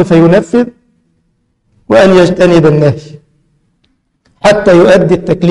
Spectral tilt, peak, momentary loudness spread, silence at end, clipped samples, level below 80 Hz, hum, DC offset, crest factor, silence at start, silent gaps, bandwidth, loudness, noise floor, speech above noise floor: -7 dB/octave; 0 dBFS; 8 LU; 0 s; 0.2%; -36 dBFS; none; under 0.1%; 8 dB; 0 s; none; 11.5 kHz; -7 LUFS; -58 dBFS; 52 dB